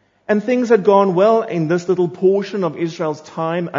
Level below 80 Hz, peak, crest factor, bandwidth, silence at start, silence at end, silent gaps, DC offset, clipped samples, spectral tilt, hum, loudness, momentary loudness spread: -68 dBFS; 0 dBFS; 16 dB; 7.6 kHz; 0.3 s; 0 s; none; under 0.1%; under 0.1%; -7 dB/octave; none; -17 LUFS; 9 LU